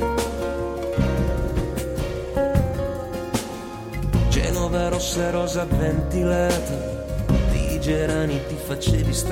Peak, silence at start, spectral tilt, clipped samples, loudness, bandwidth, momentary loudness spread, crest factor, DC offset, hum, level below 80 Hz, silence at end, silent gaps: -6 dBFS; 0 s; -5.5 dB/octave; under 0.1%; -24 LUFS; 16.5 kHz; 7 LU; 16 dB; under 0.1%; none; -28 dBFS; 0 s; none